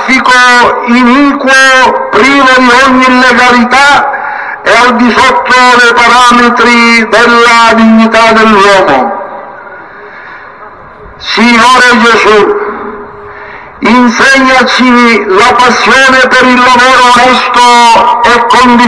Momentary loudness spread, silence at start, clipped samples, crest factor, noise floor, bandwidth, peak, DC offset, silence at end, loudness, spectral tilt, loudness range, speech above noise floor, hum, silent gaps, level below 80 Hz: 10 LU; 0 s; 9%; 4 dB; -28 dBFS; 12 kHz; 0 dBFS; 0.6%; 0 s; -3 LUFS; -3 dB/octave; 4 LU; 25 dB; none; none; -36 dBFS